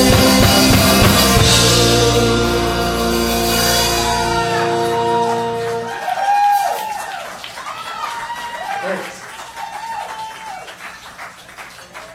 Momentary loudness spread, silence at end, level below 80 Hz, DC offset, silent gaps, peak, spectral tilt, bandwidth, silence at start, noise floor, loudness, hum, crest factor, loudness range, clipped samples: 21 LU; 0 s; -30 dBFS; under 0.1%; none; 0 dBFS; -3.5 dB/octave; 16.5 kHz; 0 s; -36 dBFS; -14 LUFS; none; 16 dB; 14 LU; under 0.1%